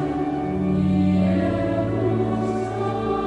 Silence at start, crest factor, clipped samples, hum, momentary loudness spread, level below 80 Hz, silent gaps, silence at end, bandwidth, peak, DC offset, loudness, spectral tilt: 0 s; 12 dB; under 0.1%; none; 5 LU; -40 dBFS; none; 0 s; 9 kHz; -10 dBFS; under 0.1%; -22 LUFS; -9 dB/octave